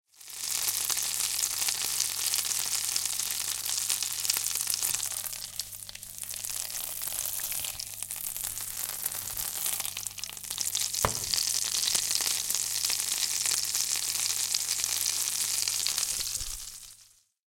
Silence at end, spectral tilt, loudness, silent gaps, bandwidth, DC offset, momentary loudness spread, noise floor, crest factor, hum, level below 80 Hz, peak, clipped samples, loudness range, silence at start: 0.5 s; 1.5 dB/octave; -28 LUFS; none; 17 kHz; under 0.1%; 9 LU; -60 dBFS; 26 dB; 50 Hz at -70 dBFS; -58 dBFS; -6 dBFS; under 0.1%; 6 LU; 0.2 s